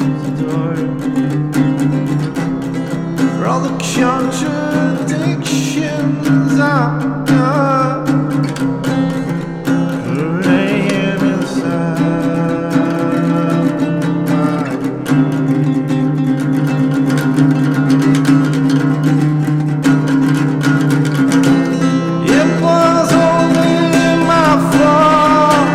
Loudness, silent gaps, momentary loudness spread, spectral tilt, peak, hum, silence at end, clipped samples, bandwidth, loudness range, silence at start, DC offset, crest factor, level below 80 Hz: -14 LUFS; none; 7 LU; -6.5 dB/octave; 0 dBFS; none; 0 s; under 0.1%; 14.5 kHz; 4 LU; 0 s; under 0.1%; 12 dB; -44 dBFS